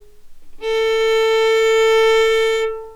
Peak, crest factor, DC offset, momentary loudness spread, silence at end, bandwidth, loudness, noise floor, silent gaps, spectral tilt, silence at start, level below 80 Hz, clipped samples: -6 dBFS; 10 dB; under 0.1%; 7 LU; 0 s; 15 kHz; -15 LUFS; -36 dBFS; none; 0 dB/octave; 0.25 s; -44 dBFS; under 0.1%